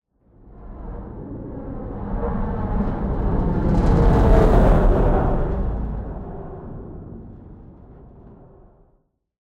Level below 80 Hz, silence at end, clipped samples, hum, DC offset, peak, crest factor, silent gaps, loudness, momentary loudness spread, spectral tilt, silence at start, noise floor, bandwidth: -24 dBFS; 1.15 s; under 0.1%; none; under 0.1%; -4 dBFS; 18 dB; none; -21 LUFS; 21 LU; -9.5 dB/octave; 0.45 s; -63 dBFS; 5.4 kHz